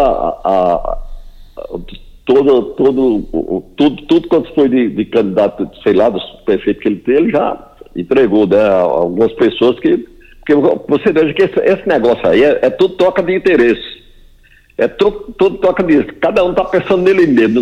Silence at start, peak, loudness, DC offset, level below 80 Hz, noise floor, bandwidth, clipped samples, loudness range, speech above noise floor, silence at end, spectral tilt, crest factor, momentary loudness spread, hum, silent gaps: 0 s; 0 dBFS; -13 LUFS; under 0.1%; -36 dBFS; -45 dBFS; 7.8 kHz; under 0.1%; 3 LU; 34 dB; 0 s; -7.5 dB/octave; 12 dB; 9 LU; none; none